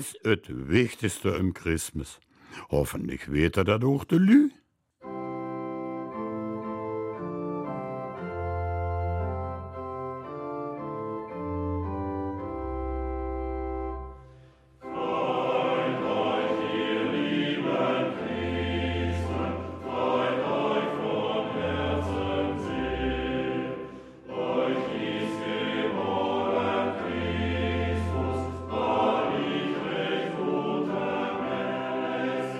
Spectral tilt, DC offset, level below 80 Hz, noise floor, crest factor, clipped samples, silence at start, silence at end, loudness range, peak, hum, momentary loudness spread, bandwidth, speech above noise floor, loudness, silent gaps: -6 dB/octave; under 0.1%; -44 dBFS; -54 dBFS; 20 dB; under 0.1%; 0 s; 0 s; 8 LU; -8 dBFS; none; 10 LU; 15.5 kHz; 29 dB; -29 LUFS; none